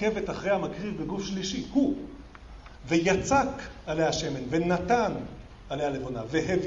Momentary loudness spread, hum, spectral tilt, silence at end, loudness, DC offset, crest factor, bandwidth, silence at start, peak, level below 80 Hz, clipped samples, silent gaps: 19 LU; none; -5 dB/octave; 0 s; -28 LUFS; under 0.1%; 18 dB; 8 kHz; 0 s; -10 dBFS; -48 dBFS; under 0.1%; none